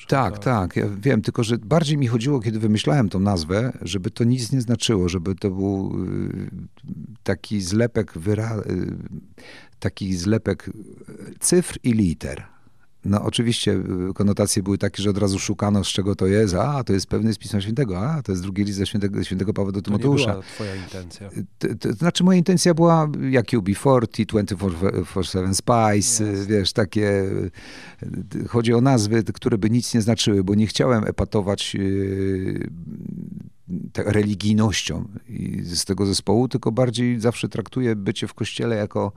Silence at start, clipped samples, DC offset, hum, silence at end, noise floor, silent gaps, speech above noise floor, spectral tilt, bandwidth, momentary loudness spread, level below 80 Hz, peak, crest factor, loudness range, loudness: 0 s; under 0.1%; 0.4%; none; 0.05 s; -53 dBFS; none; 32 dB; -5.5 dB/octave; 14.5 kHz; 13 LU; -46 dBFS; -2 dBFS; 18 dB; 5 LU; -22 LUFS